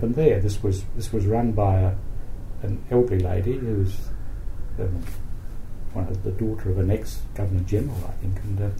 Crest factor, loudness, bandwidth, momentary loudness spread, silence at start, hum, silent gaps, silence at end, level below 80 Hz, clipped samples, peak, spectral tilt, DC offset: 18 dB; -25 LUFS; 14.5 kHz; 16 LU; 0 s; none; none; 0 s; -30 dBFS; under 0.1%; -4 dBFS; -8.5 dB/octave; under 0.1%